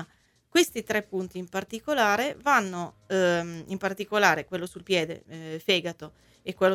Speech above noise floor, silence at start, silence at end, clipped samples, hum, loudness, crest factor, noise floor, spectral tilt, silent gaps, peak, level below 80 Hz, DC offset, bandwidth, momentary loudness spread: 36 dB; 0 s; 0 s; under 0.1%; none; -27 LUFS; 22 dB; -63 dBFS; -3.5 dB/octave; none; -6 dBFS; -64 dBFS; under 0.1%; 17 kHz; 15 LU